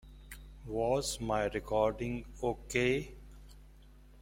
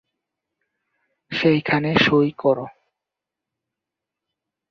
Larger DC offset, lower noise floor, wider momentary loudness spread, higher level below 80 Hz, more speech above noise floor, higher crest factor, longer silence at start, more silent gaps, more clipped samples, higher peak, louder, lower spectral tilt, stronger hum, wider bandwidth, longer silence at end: neither; second, -56 dBFS vs -86 dBFS; first, 20 LU vs 11 LU; first, -50 dBFS vs -58 dBFS; second, 23 dB vs 67 dB; about the same, 20 dB vs 22 dB; second, 0.05 s vs 1.3 s; neither; neither; second, -14 dBFS vs -2 dBFS; second, -34 LUFS vs -19 LUFS; second, -4.5 dB/octave vs -7 dB/octave; neither; first, 16.5 kHz vs 6.8 kHz; second, 0 s vs 2 s